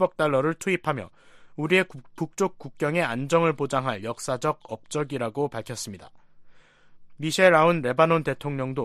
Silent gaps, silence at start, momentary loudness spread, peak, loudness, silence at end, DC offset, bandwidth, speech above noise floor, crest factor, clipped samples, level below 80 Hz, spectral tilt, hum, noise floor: none; 0 s; 14 LU; -4 dBFS; -25 LUFS; 0 s; under 0.1%; 14 kHz; 26 dB; 20 dB; under 0.1%; -62 dBFS; -5 dB/octave; none; -51 dBFS